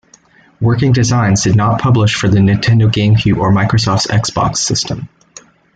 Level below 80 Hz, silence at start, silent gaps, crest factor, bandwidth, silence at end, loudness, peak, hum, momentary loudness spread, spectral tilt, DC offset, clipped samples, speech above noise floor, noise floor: -38 dBFS; 0.6 s; none; 10 dB; 9.2 kHz; 0.7 s; -12 LUFS; -2 dBFS; none; 5 LU; -5 dB/octave; under 0.1%; under 0.1%; 35 dB; -47 dBFS